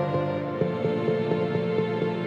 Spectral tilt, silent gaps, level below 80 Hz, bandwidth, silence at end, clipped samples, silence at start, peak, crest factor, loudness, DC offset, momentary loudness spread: -9 dB/octave; none; -70 dBFS; 7 kHz; 0 s; under 0.1%; 0 s; -12 dBFS; 14 dB; -26 LUFS; under 0.1%; 2 LU